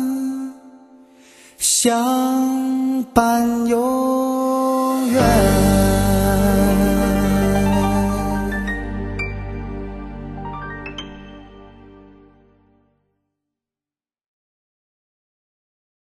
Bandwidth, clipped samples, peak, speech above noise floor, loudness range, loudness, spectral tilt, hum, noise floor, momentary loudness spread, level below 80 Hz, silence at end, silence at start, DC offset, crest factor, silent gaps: 13 kHz; under 0.1%; 0 dBFS; over 73 dB; 18 LU; -18 LUFS; -5 dB/octave; none; under -90 dBFS; 16 LU; -30 dBFS; 4.35 s; 0 s; under 0.1%; 20 dB; none